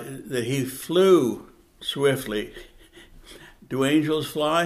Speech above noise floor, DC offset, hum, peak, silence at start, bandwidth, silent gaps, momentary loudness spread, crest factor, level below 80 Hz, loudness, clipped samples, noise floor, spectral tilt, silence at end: 27 dB; under 0.1%; none; -6 dBFS; 0 s; 15.5 kHz; none; 14 LU; 18 dB; -54 dBFS; -23 LUFS; under 0.1%; -49 dBFS; -5 dB/octave; 0 s